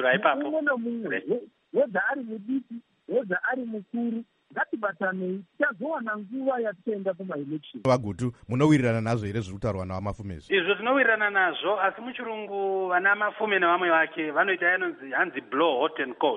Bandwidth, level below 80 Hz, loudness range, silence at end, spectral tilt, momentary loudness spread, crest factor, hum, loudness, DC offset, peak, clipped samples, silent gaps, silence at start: 10.5 kHz; -58 dBFS; 6 LU; 0 s; -6.5 dB/octave; 11 LU; 20 dB; none; -26 LUFS; under 0.1%; -6 dBFS; under 0.1%; none; 0 s